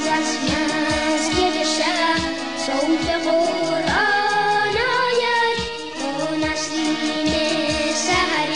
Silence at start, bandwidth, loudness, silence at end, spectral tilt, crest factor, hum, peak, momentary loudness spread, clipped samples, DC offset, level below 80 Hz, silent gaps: 0 s; 11 kHz; -20 LUFS; 0 s; -3 dB/octave; 14 dB; none; -6 dBFS; 5 LU; under 0.1%; 0.7%; -44 dBFS; none